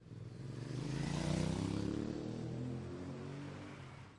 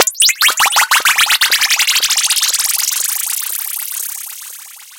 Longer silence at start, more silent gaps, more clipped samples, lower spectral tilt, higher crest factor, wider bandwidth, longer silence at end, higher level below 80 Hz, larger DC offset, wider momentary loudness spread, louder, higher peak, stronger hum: about the same, 0 s vs 0 s; neither; neither; first, -6.5 dB/octave vs 5 dB/octave; about the same, 18 dB vs 14 dB; second, 11.5 kHz vs 18 kHz; about the same, 0 s vs 0 s; first, -58 dBFS vs -64 dBFS; neither; about the same, 12 LU vs 14 LU; second, -42 LUFS vs -11 LUFS; second, -24 dBFS vs 0 dBFS; neither